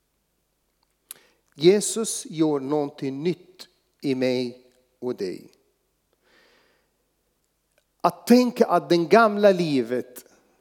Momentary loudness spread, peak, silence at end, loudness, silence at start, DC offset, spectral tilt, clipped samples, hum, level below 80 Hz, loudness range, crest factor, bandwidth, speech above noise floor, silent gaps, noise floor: 17 LU; -2 dBFS; 0.4 s; -22 LUFS; 1.6 s; under 0.1%; -5 dB/octave; under 0.1%; none; -78 dBFS; 13 LU; 22 dB; 19 kHz; 51 dB; none; -72 dBFS